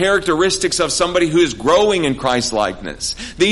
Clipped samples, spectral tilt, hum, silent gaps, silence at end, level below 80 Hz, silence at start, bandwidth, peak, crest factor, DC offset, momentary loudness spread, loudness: under 0.1%; -3.5 dB/octave; none; none; 0 s; -40 dBFS; 0 s; 11.5 kHz; -2 dBFS; 14 dB; under 0.1%; 9 LU; -16 LUFS